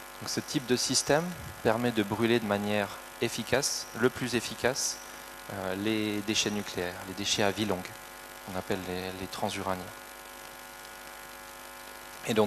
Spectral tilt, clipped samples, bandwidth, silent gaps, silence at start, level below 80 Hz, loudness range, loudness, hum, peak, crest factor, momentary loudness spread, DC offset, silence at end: -3.5 dB/octave; under 0.1%; 13.5 kHz; none; 0 s; -60 dBFS; 8 LU; -30 LUFS; none; -8 dBFS; 24 dB; 16 LU; under 0.1%; 0 s